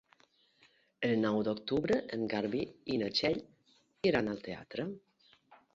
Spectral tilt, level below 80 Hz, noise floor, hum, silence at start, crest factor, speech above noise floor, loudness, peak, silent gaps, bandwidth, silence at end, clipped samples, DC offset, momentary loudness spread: -6 dB/octave; -66 dBFS; -70 dBFS; none; 1 s; 20 dB; 36 dB; -34 LUFS; -16 dBFS; none; 7.6 kHz; 0.2 s; under 0.1%; under 0.1%; 10 LU